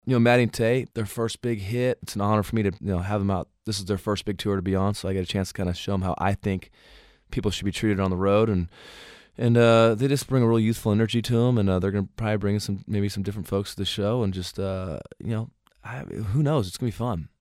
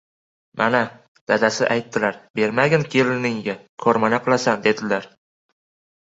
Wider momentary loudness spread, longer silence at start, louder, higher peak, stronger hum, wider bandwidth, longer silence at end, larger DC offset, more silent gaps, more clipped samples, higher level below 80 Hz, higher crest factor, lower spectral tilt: first, 11 LU vs 8 LU; second, 0.05 s vs 0.55 s; second, -25 LUFS vs -20 LUFS; second, -6 dBFS vs -2 dBFS; neither; first, 15 kHz vs 8 kHz; second, 0.15 s vs 1 s; neither; second, none vs 1.08-1.15 s, 1.21-1.27 s, 2.30-2.34 s, 3.69-3.77 s; neither; first, -48 dBFS vs -62 dBFS; about the same, 18 dB vs 20 dB; first, -6.5 dB/octave vs -5 dB/octave